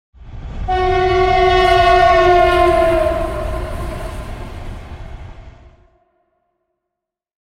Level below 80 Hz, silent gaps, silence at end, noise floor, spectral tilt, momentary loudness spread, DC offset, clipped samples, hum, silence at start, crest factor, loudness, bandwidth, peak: -28 dBFS; none; 1.95 s; -81 dBFS; -6 dB/octave; 23 LU; under 0.1%; under 0.1%; none; 0.2 s; 16 dB; -13 LUFS; 15 kHz; 0 dBFS